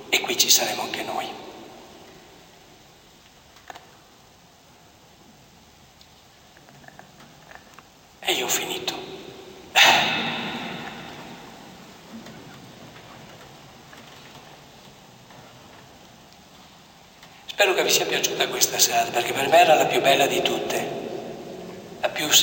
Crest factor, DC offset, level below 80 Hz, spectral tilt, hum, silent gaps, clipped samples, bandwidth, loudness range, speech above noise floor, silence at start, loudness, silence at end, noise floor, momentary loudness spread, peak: 24 dB; under 0.1%; -64 dBFS; -1 dB/octave; none; none; under 0.1%; 17 kHz; 24 LU; 31 dB; 0 s; -20 LUFS; 0 s; -52 dBFS; 27 LU; -2 dBFS